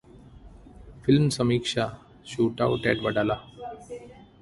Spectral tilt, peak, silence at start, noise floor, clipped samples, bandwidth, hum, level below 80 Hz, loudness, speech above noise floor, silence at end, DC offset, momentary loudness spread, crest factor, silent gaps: -6 dB/octave; -6 dBFS; 0.35 s; -48 dBFS; under 0.1%; 11.5 kHz; none; -52 dBFS; -25 LUFS; 24 dB; 0.2 s; under 0.1%; 19 LU; 22 dB; none